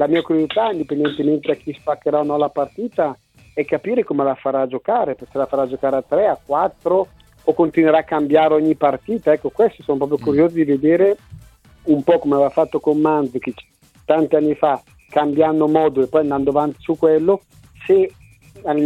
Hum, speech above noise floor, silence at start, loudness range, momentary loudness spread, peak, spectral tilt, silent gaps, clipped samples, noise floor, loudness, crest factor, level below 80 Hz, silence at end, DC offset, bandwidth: none; 28 dB; 0 s; 4 LU; 8 LU; -2 dBFS; -8 dB/octave; none; under 0.1%; -45 dBFS; -18 LUFS; 16 dB; -54 dBFS; 0 s; under 0.1%; 8.2 kHz